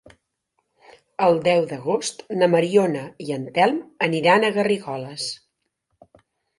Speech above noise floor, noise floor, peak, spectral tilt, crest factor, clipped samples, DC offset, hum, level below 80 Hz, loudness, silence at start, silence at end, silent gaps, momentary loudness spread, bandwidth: 54 dB; -74 dBFS; -4 dBFS; -5 dB/octave; 18 dB; under 0.1%; under 0.1%; none; -68 dBFS; -21 LUFS; 1.2 s; 1.25 s; none; 13 LU; 11.5 kHz